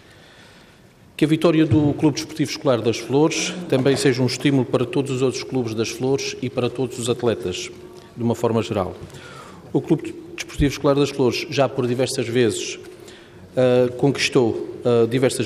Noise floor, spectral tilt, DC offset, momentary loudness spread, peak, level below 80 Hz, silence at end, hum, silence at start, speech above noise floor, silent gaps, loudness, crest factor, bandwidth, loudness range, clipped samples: -49 dBFS; -5.5 dB/octave; under 0.1%; 14 LU; -4 dBFS; -46 dBFS; 0 s; none; 1.2 s; 29 dB; none; -21 LUFS; 16 dB; 15 kHz; 5 LU; under 0.1%